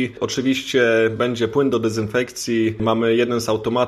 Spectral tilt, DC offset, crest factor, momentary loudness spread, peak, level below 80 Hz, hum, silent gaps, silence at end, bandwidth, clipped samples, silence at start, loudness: -5 dB/octave; under 0.1%; 16 dB; 5 LU; -4 dBFS; -52 dBFS; none; none; 0 s; 14 kHz; under 0.1%; 0 s; -19 LUFS